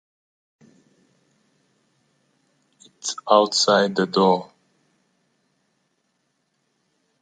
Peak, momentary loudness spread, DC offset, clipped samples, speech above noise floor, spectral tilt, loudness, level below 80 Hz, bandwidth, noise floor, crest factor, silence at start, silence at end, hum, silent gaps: -2 dBFS; 12 LU; under 0.1%; under 0.1%; 53 dB; -3.5 dB/octave; -19 LUFS; -76 dBFS; 9.4 kHz; -72 dBFS; 24 dB; 3.05 s; 2.75 s; none; none